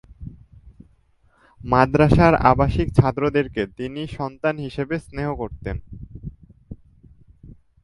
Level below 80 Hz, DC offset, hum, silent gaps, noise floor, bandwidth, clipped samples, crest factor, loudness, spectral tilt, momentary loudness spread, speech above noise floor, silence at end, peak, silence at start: -36 dBFS; under 0.1%; none; none; -59 dBFS; 11.5 kHz; under 0.1%; 22 dB; -20 LUFS; -8.5 dB/octave; 24 LU; 39 dB; 0.35 s; 0 dBFS; 0.2 s